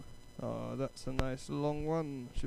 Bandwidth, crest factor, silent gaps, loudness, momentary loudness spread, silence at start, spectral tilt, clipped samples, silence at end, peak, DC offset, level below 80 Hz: 14 kHz; 28 dB; none; -38 LUFS; 6 LU; 0 s; -6.5 dB/octave; under 0.1%; 0 s; -10 dBFS; under 0.1%; -46 dBFS